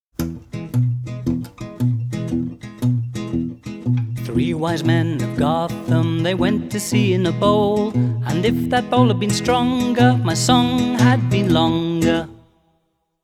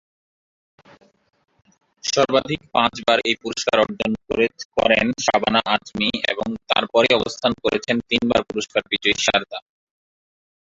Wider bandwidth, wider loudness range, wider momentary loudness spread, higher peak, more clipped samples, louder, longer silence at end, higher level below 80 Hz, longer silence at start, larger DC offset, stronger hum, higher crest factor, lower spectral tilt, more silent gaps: first, 14.5 kHz vs 7.8 kHz; first, 7 LU vs 3 LU; first, 9 LU vs 6 LU; about the same, 0 dBFS vs -2 dBFS; neither; about the same, -19 LUFS vs -20 LUFS; second, 0.9 s vs 1.2 s; first, -42 dBFS vs -52 dBFS; second, 0.2 s vs 2.05 s; neither; neither; about the same, 18 dB vs 20 dB; first, -6 dB/octave vs -3 dB/octave; second, none vs 4.65-4.70 s